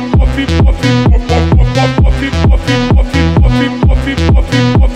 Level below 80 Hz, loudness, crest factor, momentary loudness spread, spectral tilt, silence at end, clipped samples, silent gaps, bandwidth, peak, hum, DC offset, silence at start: -12 dBFS; -10 LUFS; 8 dB; 2 LU; -7 dB/octave; 0 s; under 0.1%; none; 10 kHz; 0 dBFS; none; under 0.1%; 0 s